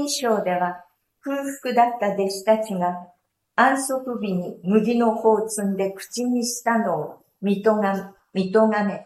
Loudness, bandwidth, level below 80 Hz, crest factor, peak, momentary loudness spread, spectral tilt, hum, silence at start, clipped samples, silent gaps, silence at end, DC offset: -22 LUFS; 15 kHz; -70 dBFS; 18 dB; -4 dBFS; 10 LU; -5 dB/octave; none; 0 s; under 0.1%; none; 0 s; under 0.1%